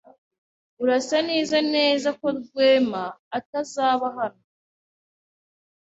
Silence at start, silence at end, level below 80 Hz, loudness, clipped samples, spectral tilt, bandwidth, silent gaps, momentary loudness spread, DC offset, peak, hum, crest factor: 0.8 s; 1.55 s; -70 dBFS; -23 LUFS; under 0.1%; -3.5 dB/octave; 8 kHz; 3.19-3.31 s, 3.46-3.53 s; 12 LU; under 0.1%; -6 dBFS; none; 18 dB